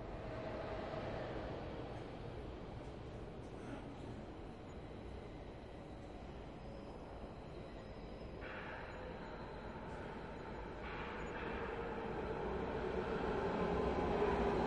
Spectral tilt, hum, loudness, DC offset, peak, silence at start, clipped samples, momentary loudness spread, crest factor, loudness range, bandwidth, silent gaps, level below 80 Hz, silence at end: -7 dB/octave; none; -45 LUFS; under 0.1%; -24 dBFS; 0 s; under 0.1%; 13 LU; 20 dB; 10 LU; 11 kHz; none; -54 dBFS; 0 s